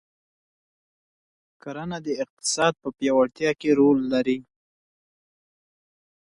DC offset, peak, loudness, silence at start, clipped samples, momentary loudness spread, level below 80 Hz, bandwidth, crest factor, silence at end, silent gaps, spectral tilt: under 0.1%; -8 dBFS; -23 LUFS; 1.65 s; under 0.1%; 13 LU; -64 dBFS; 11.5 kHz; 18 dB; 1.9 s; 2.30-2.37 s; -4 dB/octave